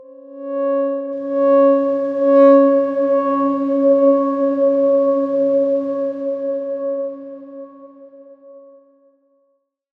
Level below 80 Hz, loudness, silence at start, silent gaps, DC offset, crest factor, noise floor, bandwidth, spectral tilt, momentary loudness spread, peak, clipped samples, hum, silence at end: -72 dBFS; -16 LUFS; 0.25 s; none; under 0.1%; 16 dB; -66 dBFS; 4.1 kHz; -8 dB/octave; 14 LU; -2 dBFS; under 0.1%; none; 1.4 s